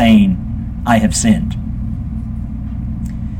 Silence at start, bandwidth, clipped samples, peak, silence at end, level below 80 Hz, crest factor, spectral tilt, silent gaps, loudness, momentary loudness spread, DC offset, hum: 0 s; 15.5 kHz; under 0.1%; 0 dBFS; 0 s; -26 dBFS; 16 dB; -5.5 dB/octave; none; -17 LUFS; 12 LU; under 0.1%; none